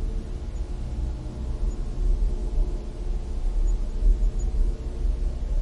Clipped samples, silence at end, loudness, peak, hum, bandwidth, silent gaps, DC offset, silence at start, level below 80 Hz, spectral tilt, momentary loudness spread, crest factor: under 0.1%; 0 s; -31 LUFS; -10 dBFS; none; 7.4 kHz; none; 0.4%; 0 s; -24 dBFS; -7.5 dB/octave; 7 LU; 14 dB